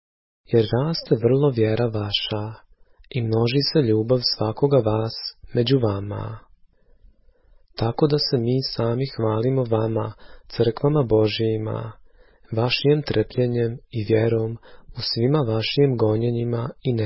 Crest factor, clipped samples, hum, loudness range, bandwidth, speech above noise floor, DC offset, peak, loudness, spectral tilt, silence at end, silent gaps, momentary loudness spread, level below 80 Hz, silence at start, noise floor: 16 dB; under 0.1%; none; 3 LU; 5.8 kHz; 33 dB; under 0.1%; -6 dBFS; -22 LUFS; -10.5 dB/octave; 0 s; none; 11 LU; -48 dBFS; 0.5 s; -55 dBFS